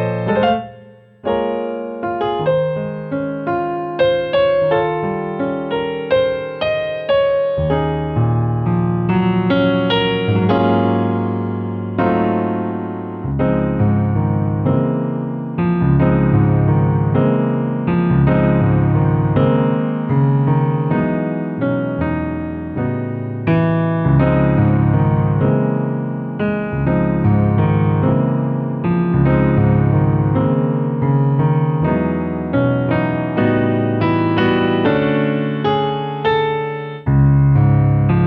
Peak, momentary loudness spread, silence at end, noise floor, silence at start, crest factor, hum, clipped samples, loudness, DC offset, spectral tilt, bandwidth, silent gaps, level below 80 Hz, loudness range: -4 dBFS; 7 LU; 0 s; -42 dBFS; 0 s; 12 dB; none; under 0.1%; -17 LUFS; under 0.1%; -11 dB/octave; 4.9 kHz; none; -36 dBFS; 3 LU